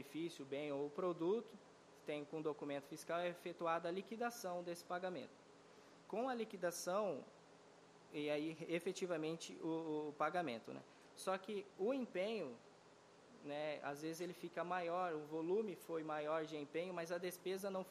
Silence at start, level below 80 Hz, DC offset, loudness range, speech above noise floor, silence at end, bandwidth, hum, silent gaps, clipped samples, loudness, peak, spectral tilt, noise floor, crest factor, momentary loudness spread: 0 s; under -90 dBFS; under 0.1%; 2 LU; 22 dB; 0 s; 15 kHz; none; none; under 0.1%; -45 LUFS; -26 dBFS; -5 dB/octave; -66 dBFS; 18 dB; 18 LU